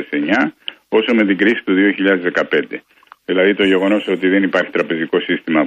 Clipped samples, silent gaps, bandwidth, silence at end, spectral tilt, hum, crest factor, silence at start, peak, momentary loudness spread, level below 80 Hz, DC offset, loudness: under 0.1%; none; 7.6 kHz; 0 s; -6.5 dB/octave; none; 14 dB; 0 s; -2 dBFS; 7 LU; -62 dBFS; under 0.1%; -15 LUFS